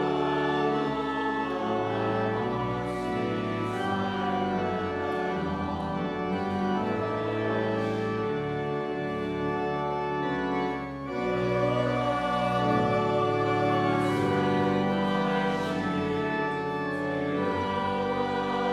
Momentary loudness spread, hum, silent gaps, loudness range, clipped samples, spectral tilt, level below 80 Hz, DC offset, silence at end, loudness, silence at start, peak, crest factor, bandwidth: 5 LU; none; none; 4 LU; under 0.1%; -7 dB/octave; -54 dBFS; under 0.1%; 0 s; -28 LUFS; 0 s; -12 dBFS; 14 dB; 12.5 kHz